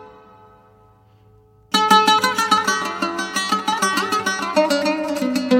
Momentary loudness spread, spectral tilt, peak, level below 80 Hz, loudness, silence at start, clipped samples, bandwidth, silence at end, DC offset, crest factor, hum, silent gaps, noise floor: 9 LU; -2.5 dB/octave; 0 dBFS; -62 dBFS; -18 LUFS; 0 s; under 0.1%; 17 kHz; 0 s; under 0.1%; 20 dB; none; none; -52 dBFS